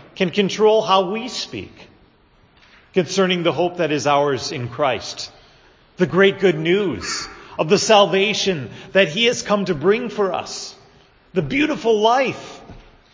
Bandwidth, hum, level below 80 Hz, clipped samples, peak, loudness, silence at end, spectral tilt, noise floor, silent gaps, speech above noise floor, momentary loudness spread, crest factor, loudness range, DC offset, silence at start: 7.6 kHz; none; -52 dBFS; under 0.1%; 0 dBFS; -18 LUFS; 0.35 s; -4.5 dB/octave; -54 dBFS; none; 36 dB; 14 LU; 20 dB; 4 LU; under 0.1%; 0.15 s